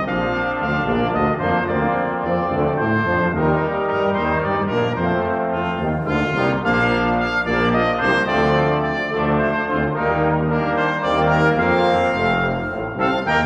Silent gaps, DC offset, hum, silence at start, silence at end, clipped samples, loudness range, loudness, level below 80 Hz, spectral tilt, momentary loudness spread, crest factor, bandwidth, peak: none; under 0.1%; none; 0 s; 0 s; under 0.1%; 2 LU; -19 LUFS; -40 dBFS; -7.5 dB/octave; 4 LU; 16 dB; 9 kHz; -4 dBFS